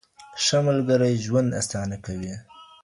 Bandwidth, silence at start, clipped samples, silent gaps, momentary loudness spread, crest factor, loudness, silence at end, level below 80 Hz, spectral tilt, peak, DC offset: 11.5 kHz; 0.2 s; under 0.1%; none; 14 LU; 14 dB; -23 LUFS; 0.2 s; -52 dBFS; -5 dB/octave; -10 dBFS; under 0.1%